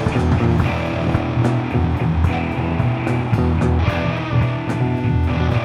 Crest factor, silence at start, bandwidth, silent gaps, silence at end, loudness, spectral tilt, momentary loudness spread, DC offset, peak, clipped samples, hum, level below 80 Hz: 14 dB; 0 s; 10 kHz; none; 0 s; -19 LUFS; -8 dB/octave; 3 LU; under 0.1%; -4 dBFS; under 0.1%; none; -28 dBFS